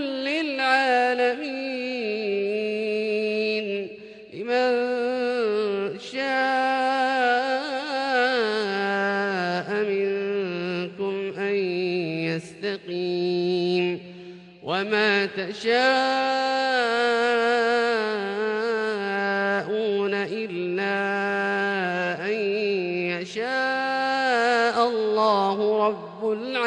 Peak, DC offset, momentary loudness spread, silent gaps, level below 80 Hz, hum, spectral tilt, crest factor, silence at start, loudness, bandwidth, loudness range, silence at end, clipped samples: -8 dBFS; under 0.1%; 8 LU; none; -72 dBFS; none; -5 dB/octave; 16 dB; 0 s; -24 LUFS; 10 kHz; 4 LU; 0 s; under 0.1%